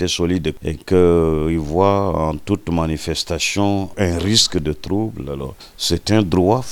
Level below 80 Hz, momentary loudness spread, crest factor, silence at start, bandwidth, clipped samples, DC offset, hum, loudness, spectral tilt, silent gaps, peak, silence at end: -34 dBFS; 9 LU; 18 dB; 0 s; 18.5 kHz; under 0.1%; under 0.1%; none; -18 LUFS; -5 dB/octave; none; 0 dBFS; 0 s